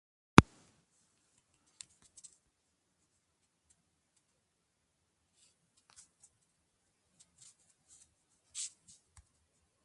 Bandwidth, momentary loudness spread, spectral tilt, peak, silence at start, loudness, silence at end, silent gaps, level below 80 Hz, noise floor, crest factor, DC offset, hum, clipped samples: 11.5 kHz; 29 LU; -5 dB/octave; 0 dBFS; 0.4 s; -28 LUFS; 9.45 s; none; -54 dBFS; -81 dBFS; 40 dB; under 0.1%; none; under 0.1%